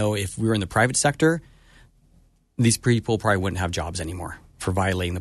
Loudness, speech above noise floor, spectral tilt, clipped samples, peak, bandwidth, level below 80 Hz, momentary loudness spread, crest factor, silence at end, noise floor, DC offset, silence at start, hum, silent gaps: -23 LUFS; 36 dB; -4.5 dB/octave; under 0.1%; -6 dBFS; 12.5 kHz; -46 dBFS; 12 LU; 18 dB; 0 s; -58 dBFS; under 0.1%; 0 s; none; none